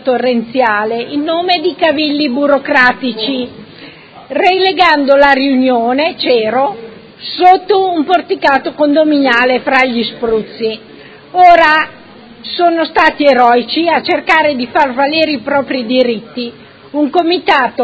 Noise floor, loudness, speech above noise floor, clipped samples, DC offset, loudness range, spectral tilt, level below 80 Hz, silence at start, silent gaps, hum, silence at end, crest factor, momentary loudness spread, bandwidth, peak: -35 dBFS; -11 LUFS; 24 dB; 0.4%; under 0.1%; 3 LU; -5 dB/octave; -50 dBFS; 0.05 s; none; none; 0 s; 12 dB; 12 LU; 8 kHz; 0 dBFS